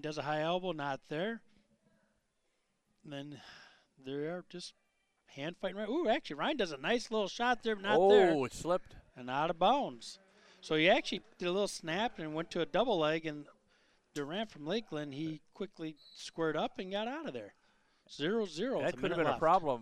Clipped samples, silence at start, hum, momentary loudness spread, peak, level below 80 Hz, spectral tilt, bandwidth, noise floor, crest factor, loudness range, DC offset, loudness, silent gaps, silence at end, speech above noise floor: under 0.1%; 0.05 s; none; 18 LU; -14 dBFS; -66 dBFS; -5 dB/octave; 12.5 kHz; -80 dBFS; 22 dB; 15 LU; under 0.1%; -34 LUFS; none; 0 s; 45 dB